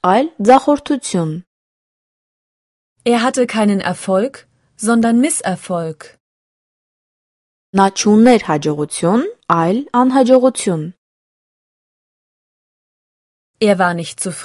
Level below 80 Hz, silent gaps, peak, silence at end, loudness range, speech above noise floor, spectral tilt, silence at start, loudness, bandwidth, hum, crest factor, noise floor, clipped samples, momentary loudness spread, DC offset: -58 dBFS; 1.47-2.96 s, 6.20-7.73 s, 10.98-13.54 s; 0 dBFS; 0 s; 6 LU; over 76 dB; -5 dB/octave; 0.05 s; -15 LUFS; 11.5 kHz; none; 16 dB; under -90 dBFS; under 0.1%; 12 LU; under 0.1%